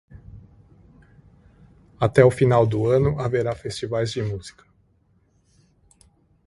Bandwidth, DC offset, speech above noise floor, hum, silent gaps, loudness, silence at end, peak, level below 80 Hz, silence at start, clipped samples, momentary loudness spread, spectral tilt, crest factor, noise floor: 11.5 kHz; under 0.1%; 42 dB; none; none; -21 LUFS; 1.95 s; -2 dBFS; -48 dBFS; 0.1 s; under 0.1%; 14 LU; -7 dB/octave; 22 dB; -62 dBFS